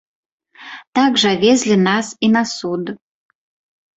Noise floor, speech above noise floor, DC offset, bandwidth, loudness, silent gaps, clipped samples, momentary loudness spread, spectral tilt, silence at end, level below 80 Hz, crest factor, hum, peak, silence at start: -38 dBFS; 22 dB; under 0.1%; 8.2 kHz; -16 LUFS; 0.87-0.93 s; under 0.1%; 19 LU; -4 dB/octave; 1 s; -58 dBFS; 16 dB; none; -2 dBFS; 0.6 s